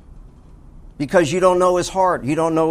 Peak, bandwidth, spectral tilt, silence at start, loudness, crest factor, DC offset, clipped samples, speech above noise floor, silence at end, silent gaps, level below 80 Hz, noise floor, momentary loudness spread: -2 dBFS; 15 kHz; -5.5 dB/octave; 0.15 s; -17 LUFS; 16 dB; under 0.1%; under 0.1%; 26 dB; 0 s; none; -42 dBFS; -42 dBFS; 4 LU